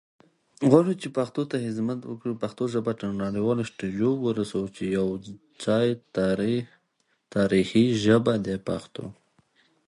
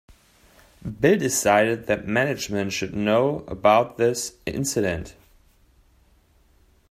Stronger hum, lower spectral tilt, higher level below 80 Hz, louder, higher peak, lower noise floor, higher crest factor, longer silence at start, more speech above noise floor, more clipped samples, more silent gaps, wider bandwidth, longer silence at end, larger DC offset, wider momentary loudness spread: neither; first, -7 dB/octave vs -4.5 dB/octave; second, -58 dBFS vs -52 dBFS; second, -26 LUFS vs -22 LUFS; about the same, -4 dBFS vs -4 dBFS; first, -72 dBFS vs -59 dBFS; about the same, 22 dB vs 20 dB; second, 0.6 s vs 0.85 s; first, 47 dB vs 37 dB; neither; neither; second, 11.5 kHz vs 16 kHz; second, 0.8 s vs 1.8 s; neither; about the same, 12 LU vs 10 LU